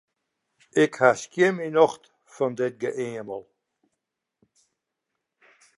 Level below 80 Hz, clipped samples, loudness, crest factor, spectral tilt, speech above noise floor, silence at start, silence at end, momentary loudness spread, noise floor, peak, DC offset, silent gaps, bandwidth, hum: -76 dBFS; under 0.1%; -24 LUFS; 24 dB; -5 dB/octave; 59 dB; 0.75 s; 2.35 s; 16 LU; -82 dBFS; -4 dBFS; under 0.1%; none; 11.5 kHz; none